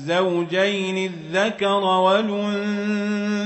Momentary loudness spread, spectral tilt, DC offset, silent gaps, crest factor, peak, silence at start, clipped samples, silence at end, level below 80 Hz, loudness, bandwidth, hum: 6 LU; -5.5 dB/octave; under 0.1%; none; 16 dB; -6 dBFS; 0 s; under 0.1%; 0 s; -70 dBFS; -21 LUFS; 8.4 kHz; none